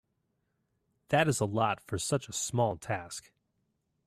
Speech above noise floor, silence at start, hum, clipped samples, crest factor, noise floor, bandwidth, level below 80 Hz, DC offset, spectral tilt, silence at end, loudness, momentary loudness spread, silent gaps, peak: 48 dB; 1.1 s; none; under 0.1%; 22 dB; -79 dBFS; 15.5 kHz; -64 dBFS; under 0.1%; -4.5 dB/octave; 0.85 s; -31 LUFS; 9 LU; none; -12 dBFS